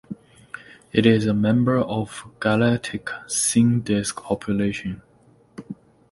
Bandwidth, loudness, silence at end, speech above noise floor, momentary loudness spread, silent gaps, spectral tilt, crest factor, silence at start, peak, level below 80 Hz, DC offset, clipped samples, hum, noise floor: 11.5 kHz; -21 LUFS; 0.35 s; 35 dB; 22 LU; none; -5 dB/octave; 20 dB; 0.1 s; -2 dBFS; -52 dBFS; under 0.1%; under 0.1%; none; -55 dBFS